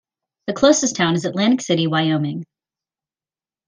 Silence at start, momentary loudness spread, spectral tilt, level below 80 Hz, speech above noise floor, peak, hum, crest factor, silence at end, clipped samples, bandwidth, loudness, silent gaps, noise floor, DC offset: 0.45 s; 13 LU; -4.5 dB/octave; -58 dBFS; over 72 dB; -2 dBFS; none; 18 dB; 1.25 s; under 0.1%; 10 kHz; -18 LUFS; none; under -90 dBFS; under 0.1%